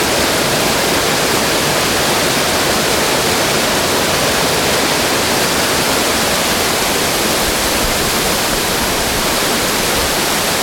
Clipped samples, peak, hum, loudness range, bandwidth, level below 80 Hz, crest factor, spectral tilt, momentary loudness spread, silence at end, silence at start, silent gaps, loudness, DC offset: under 0.1%; -2 dBFS; none; 1 LU; 18 kHz; -34 dBFS; 12 dB; -2 dB/octave; 1 LU; 0 s; 0 s; none; -13 LUFS; under 0.1%